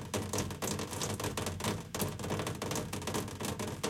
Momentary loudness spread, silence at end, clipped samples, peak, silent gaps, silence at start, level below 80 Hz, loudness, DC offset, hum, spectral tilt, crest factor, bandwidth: 2 LU; 0 s; under 0.1%; -20 dBFS; none; 0 s; -58 dBFS; -37 LUFS; under 0.1%; none; -4 dB/octave; 18 dB; 17 kHz